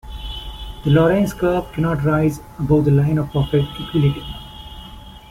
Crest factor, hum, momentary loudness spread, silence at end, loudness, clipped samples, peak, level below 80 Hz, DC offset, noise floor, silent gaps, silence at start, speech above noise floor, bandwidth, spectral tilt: 14 dB; none; 20 LU; 0.1 s; -18 LUFS; under 0.1%; -4 dBFS; -36 dBFS; under 0.1%; -38 dBFS; none; 0.05 s; 21 dB; 15 kHz; -8 dB/octave